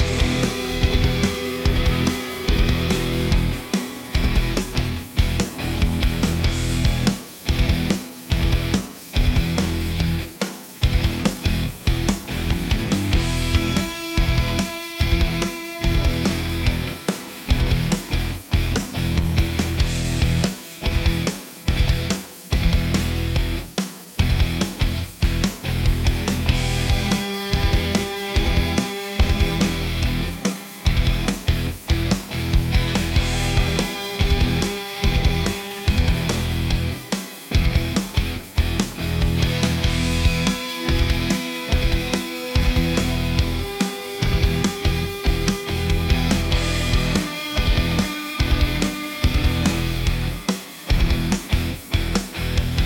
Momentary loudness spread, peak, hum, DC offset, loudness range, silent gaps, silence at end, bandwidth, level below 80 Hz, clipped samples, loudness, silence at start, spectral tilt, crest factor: 5 LU; -4 dBFS; none; under 0.1%; 2 LU; none; 0 s; 17 kHz; -24 dBFS; under 0.1%; -22 LUFS; 0 s; -5 dB/octave; 16 dB